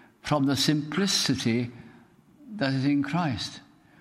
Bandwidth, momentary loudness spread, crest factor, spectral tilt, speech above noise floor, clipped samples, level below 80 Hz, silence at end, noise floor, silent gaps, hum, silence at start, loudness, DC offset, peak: 16 kHz; 12 LU; 18 dB; -4.5 dB/octave; 29 dB; under 0.1%; -60 dBFS; 0.4 s; -55 dBFS; none; none; 0.25 s; -26 LUFS; under 0.1%; -10 dBFS